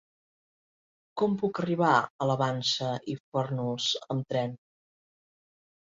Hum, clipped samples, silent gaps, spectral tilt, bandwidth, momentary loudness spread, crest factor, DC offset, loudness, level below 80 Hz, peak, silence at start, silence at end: none; under 0.1%; 2.10-2.19 s, 3.20-3.32 s; -5 dB/octave; 7.8 kHz; 9 LU; 22 dB; under 0.1%; -29 LUFS; -70 dBFS; -8 dBFS; 1.15 s; 1.35 s